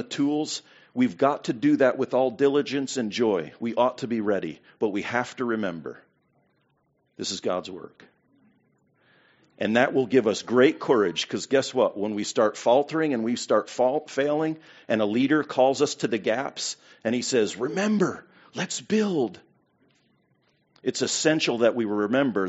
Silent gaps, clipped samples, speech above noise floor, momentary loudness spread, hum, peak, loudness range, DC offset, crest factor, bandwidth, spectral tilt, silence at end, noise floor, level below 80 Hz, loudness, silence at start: none; under 0.1%; 45 dB; 10 LU; none; -4 dBFS; 8 LU; under 0.1%; 22 dB; 8 kHz; -4 dB/octave; 0 s; -70 dBFS; -72 dBFS; -25 LUFS; 0 s